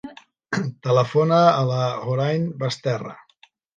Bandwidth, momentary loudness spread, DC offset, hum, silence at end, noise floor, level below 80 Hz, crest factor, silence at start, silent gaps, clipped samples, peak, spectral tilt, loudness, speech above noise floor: 8.8 kHz; 12 LU; under 0.1%; none; 0.65 s; -57 dBFS; -66 dBFS; 20 dB; 0.05 s; none; under 0.1%; -2 dBFS; -6.5 dB/octave; -21 LUFS; 37 dB